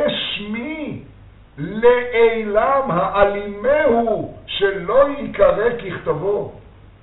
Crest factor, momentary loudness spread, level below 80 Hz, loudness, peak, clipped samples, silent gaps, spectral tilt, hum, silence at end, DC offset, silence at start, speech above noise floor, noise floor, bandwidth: 18 dB; 12 LU; -42 dBFS; -18 LUFS; 0 dBFS; under 0.1%; none; -3 dB/octave; none; 0.4 s; under 0.1%; 0 s; 27 dB; -44 dBFS; 4.1 kHz